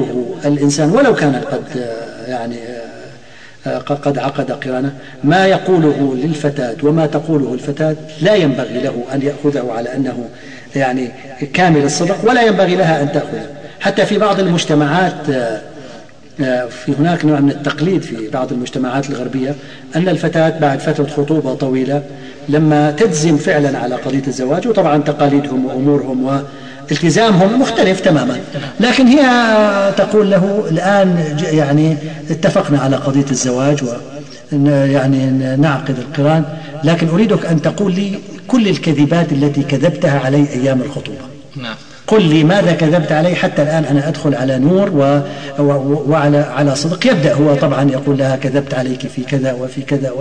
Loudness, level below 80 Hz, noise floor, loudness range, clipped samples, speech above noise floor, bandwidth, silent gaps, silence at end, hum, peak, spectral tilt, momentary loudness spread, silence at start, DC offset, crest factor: -14 LUFS; -52 dBFS; -39 dBFS; 5 LU; under 0.1%; 26 dB; 10 kHz; none; 0 s; none; 0 dBFS; -6 dB/octave; 11 LU; 0 s; 1%; 14 dB